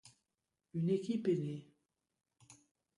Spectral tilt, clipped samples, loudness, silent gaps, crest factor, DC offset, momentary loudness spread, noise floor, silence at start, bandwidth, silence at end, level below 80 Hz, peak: -8 dB/octave; under 0.1%; -37 LUFS; none; 18 dB; under 0.1%; 11 LU; -89 dBFS; 0.05 s; 11.5 kHz; 0.45 s; -82 dBFS; -24 dBFS